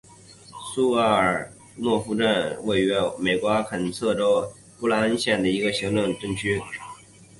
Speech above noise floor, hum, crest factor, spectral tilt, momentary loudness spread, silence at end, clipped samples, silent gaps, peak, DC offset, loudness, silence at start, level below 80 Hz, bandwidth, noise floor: 25 dB; none; 16 dB; -5 dB/octave; 13 LU; 0.15 s; under 0.1%; none; -8 dBFS; under 0.1%; -23 LUFS; 0.3 s; -54 dBFS; 11.5 kHz; -48 dBFS